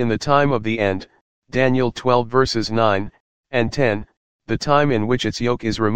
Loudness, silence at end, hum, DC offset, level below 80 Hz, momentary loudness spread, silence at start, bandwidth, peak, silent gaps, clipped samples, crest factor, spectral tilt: -19 LUFS; 0 s; none; 2%; -44 dBFS; 8 LU; 0 s; 9.6 kHz; 0 dBFS; 1.21-1.42 s, 3.20-3.43 s, 4.17-4.39 s; under 0.1%; 18 dB; -6 dB/octave